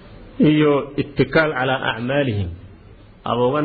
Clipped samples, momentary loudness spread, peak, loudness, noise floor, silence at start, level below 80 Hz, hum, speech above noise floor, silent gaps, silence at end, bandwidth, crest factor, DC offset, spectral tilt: under 0.1%; 11 LU; -4 dBFS; -19 LUFS; -44 dBFS; 0.05 s; -46 dBFS; none; 26 dB; none; 0 s; 4.8 kHz; 16 dB; under 0.1%; -10 dB/octave